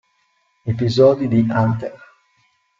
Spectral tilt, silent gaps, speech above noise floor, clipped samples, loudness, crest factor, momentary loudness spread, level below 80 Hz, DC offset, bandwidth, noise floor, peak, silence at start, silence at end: -8 dB/octave; none; 48 dB; under 0.1%; -17 LUFS; 18 dB; 15 LU; -52 dBFS; under 0.1%; 7.4 kHz; -64 dBFS; -2 dBFS; 0.65 s; 0.85 s